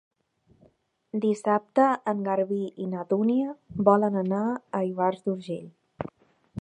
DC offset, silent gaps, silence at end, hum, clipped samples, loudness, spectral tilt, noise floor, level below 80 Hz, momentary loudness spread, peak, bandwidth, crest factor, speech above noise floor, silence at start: under 0.1%; none; 0 s; none; under 0.1%; -26 LUFS; -8 dB/octave; -65 dBFS; -64 dBFS; 15 LU; -6 dBFS; 9.8 kHz; 22 dB; 39 dB; 1.15 s